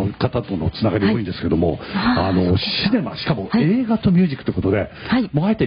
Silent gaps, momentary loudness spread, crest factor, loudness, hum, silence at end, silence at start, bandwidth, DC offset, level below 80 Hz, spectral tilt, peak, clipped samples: none; 5 LU; 12 dB; -19 LUFS; none; 0 s; 0 s; 5.4 kHz; under 0.1%; -36 dBFS; -11.5 dB/octave; -6 dBFS; under 0.1%